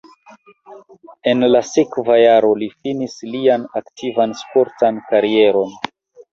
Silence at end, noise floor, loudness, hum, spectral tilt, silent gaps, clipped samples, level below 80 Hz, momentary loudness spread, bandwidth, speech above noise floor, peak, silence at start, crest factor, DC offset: 0.45 s; -47 dBFS; -16 LUFS; none; -5 dB/octave; none; under 0.1%; -60 dBFS; 12 LU; 7.6 kHz; 31 dB; -2 dBFS; 0.7 s; 16 dB; under 0.1%